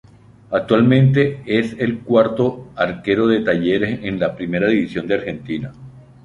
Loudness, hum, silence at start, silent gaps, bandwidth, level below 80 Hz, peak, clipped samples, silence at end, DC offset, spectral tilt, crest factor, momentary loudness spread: -18 LUFS; none; 0.5 s; none; 7.4 kHz; -50 dBFS; -2 dBFS; under 0.1%; 0.25 s; under 0.1%; -8.5 dB/octave; 16 dB; 10 LU